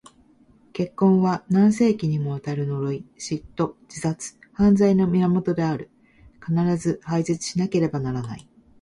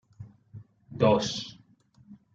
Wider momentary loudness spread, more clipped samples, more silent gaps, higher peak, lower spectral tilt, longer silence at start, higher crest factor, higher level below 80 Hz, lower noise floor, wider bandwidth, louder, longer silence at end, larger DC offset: second, 13 LU vs 26 LU; neither; neither; about the same, -8 dBFS vs -10 dBFS; first, -7 dB/octave vs -5.5 dB/octave; first, 0.75 s vs 0.2 s; second, 16 dB vs 22 dB; first, -52 dBFS vs -64 dBFS; second, -56 dBFS vs -60 dBFS; first, 11.5 kHz vs 7.8 kHz; first, -23 LUFS vs -26 LUFS; first, 0.4 s vs 0.2 s; neither